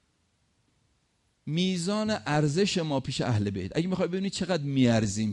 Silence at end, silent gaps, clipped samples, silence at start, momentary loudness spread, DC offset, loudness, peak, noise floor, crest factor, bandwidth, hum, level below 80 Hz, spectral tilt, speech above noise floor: 0 s; none; under 0.1%; 1.45 s; 6 LU; under 0.1%; -28 LUFS; -12 dBFS; -72 dBFS; 16 dB; 11.5 kHz; none; -58 dBFS; -5.5 dB/octave; 45 dB